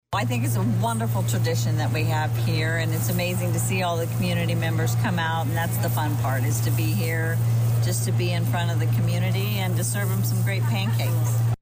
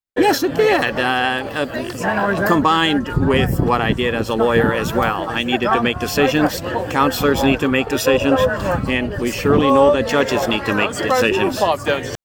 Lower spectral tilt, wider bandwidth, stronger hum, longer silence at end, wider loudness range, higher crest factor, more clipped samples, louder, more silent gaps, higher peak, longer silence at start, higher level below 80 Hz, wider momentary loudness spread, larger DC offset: about the same, -5.5 dB/octave vs -5 dB/octave; about the same, 16 kHz vs 17.5 kHz; neither; about the same, 0.05 s vs 0.1 s; about the same, 1 LU vs 1 LU; second, 8 dB vs 14 dB; neither; second, -23 LUFS vs -17 LUFS; neither; second, -14 dBFS vs -2 dBFS; about the same, 0.1 s vs 0.15 s; second, -48 dBFS vs -36 dBFS; second, 1 LU vs 6 LU; neither